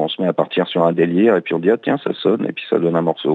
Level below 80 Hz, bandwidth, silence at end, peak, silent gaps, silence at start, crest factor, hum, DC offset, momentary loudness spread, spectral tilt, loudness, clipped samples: -78 dBFS; 4.5 kHz; 0 s; -2 dBFS; none; 0 s; 14 dB; none; under 0.1%; 4 LU; -8.5 dB/octave; -17 LUFS; under 0.1%